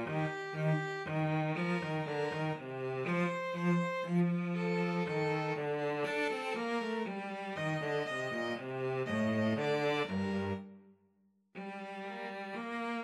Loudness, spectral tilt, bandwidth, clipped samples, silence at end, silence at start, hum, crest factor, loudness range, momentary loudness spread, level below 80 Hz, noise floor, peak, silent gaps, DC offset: -35 LUFS; -7 dB/octave; 11.5 kHz; under 0.1%; 0 s; 0 s; none; 14 dB; 2 LU; 9 LU; -78 dBFS; -72 dBFS; -22 dBFS; none; under 0.1%